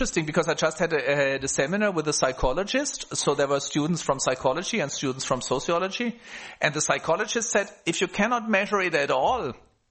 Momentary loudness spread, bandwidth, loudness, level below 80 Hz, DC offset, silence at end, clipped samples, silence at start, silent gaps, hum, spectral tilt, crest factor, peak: 5 LU; 8.8 kHz; -25 LUFS; -46 dBFS; under 0.1%; 0.35 s; under 0.1%; 0 s; none; none; -3.5 dB/octave; 20 dB; -4 dBFS